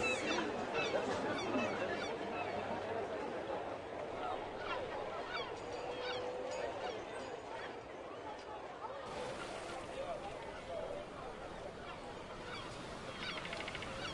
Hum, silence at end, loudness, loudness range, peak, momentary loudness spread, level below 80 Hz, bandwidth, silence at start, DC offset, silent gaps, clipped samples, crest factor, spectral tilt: none; 0 s; -42 LUFS; 7 LU; -24 dBFS; 10 LU; -64 dBFS; 11.5 kHz; 0 s; under 0.1%; none; under 0.1%; 18 dB; -4 dB/octave